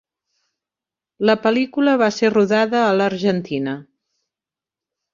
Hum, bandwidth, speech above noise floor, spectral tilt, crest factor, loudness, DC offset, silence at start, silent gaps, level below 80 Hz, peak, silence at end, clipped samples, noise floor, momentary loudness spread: none; 7.4 kHz; 72 dB; -6 dB/octave; 18 dB; -18 LUFS; under 0.1%; 1.2 s; none; -64 dBFS; -2 dBFS; 1.3 s; under 0.1%; -89 dBFS; 8 LU